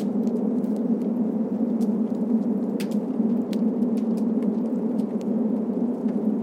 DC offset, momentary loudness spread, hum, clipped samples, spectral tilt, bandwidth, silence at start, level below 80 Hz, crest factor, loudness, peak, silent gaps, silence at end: under 0.1%; 2 LU; none; under 0.1%; -9 dB/octave; 10.5 kHz; 0 s; -74 dBFS; 12 dB; -25 LUFS; -12 dBFS; none; 0 s